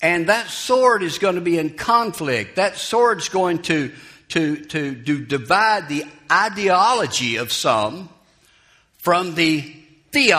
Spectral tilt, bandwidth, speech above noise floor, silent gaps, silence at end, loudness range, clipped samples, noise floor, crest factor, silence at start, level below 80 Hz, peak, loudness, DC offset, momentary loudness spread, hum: -3.5 dB/octave; 15.5 kHz; 37 dB; none; 0 s; 3 LU; under 0.1%; -56 dBFS; 20 dB; 0 s; -58 dBFS; 0 dBFS; -19 LUFS; under 0.1%; 8 LU; none